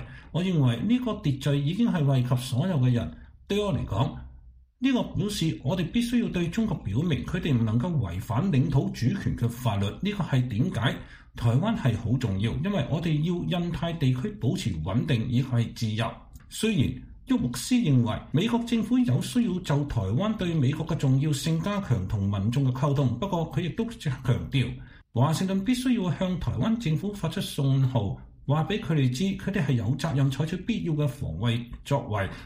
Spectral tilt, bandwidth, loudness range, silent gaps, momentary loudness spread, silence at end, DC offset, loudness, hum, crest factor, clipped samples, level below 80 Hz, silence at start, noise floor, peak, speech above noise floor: -7 dB/octave; 15.5 kHz; 2 LU; none; 5 LU; 0 s; under 0.1%; -27 LUFS; none; 14 dB; under 0.1%; -46 dBFS; 0 s; -51 dBFS; -12 dBFS; 25 dB